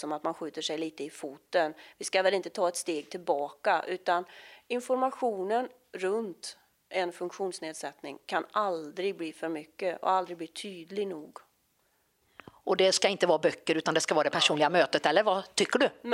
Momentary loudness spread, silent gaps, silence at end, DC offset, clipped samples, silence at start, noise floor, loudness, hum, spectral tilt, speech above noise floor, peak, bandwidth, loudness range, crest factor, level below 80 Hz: 14 LU; none; 0 s; under 0.1%; under 0.1%; 0 s; -72 dBFS; -30 LUFS; none; -3 dB/octave; 42 dB; -8 dBFS; 16 kHz; 9 LU; 24 dB; -80 dBFS